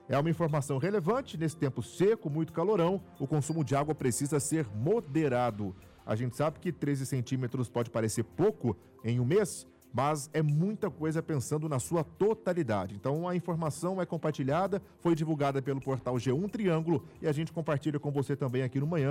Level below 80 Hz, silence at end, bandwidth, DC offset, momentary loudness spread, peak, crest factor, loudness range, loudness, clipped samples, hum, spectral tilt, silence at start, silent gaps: -64 dBFS; 0 s; 16 kHz; under 0.1%; 5 LU; -20 dBFS; 12 dB; 2 LU; -32 LUFS; under 0.1%; none; -6.5 dB/octave; 0.1 s; none